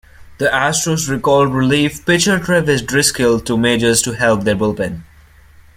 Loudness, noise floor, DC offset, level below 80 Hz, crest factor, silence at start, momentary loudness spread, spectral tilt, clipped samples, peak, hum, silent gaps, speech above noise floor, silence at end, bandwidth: -15 LUFS; -44 dBFS; under 0.1%; -42 dBFS; 16 dB; 0.2 s; 5 LU; -4 dB/octave; under 0.1%; 0 dBFS; none; none; 30 dB; 0.75 s; 16.5 kHz